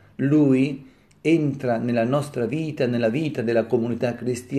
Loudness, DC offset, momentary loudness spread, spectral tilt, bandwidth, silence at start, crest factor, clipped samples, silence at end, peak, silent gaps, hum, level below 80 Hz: -22 LUFS; under 0.1%; 7 LU; -7.5 dB/octave; 13 kHz; 0.2 s; 14 dB; under 0.1%; 0 s; -8 dBFS; none; none; -64 dBFS